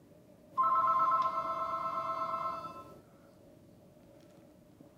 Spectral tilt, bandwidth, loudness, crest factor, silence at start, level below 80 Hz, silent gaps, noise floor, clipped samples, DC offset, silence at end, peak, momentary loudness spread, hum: -5.5 dB/octave; 15.5 kHz; -32 LUFS; 16 dB; 0.5 s; -72 dBFS; none; -59 dBFS; under 0.1%; under 0.1%; 0.55 s; -18 dBFS; 16 LU; none